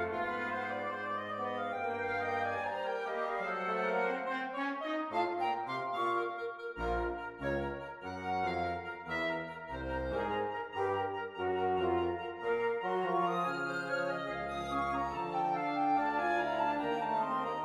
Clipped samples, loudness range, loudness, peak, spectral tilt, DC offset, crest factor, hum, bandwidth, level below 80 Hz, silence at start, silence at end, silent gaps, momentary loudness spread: under 0.1%; 3 LU; -35 LUFS; -20 dBFS; -6 dB/octave; under 0.1%; 14 dB; none; 12 kHz; -56 dBFS; 0 s; 0 s; none; 6 LU